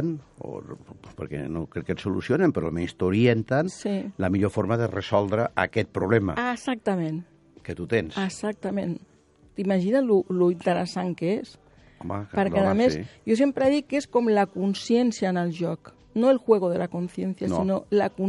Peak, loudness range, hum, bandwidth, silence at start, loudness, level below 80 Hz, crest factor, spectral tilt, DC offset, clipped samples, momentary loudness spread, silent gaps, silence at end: -4 dBFS; 4 LU; none; 11.5 kHz; 0 s; -25 LUFS; -56 dBFS; 20 dB; -7 dB/octave; under 0.1%; under 0.1%; 14 LU; none; 0 s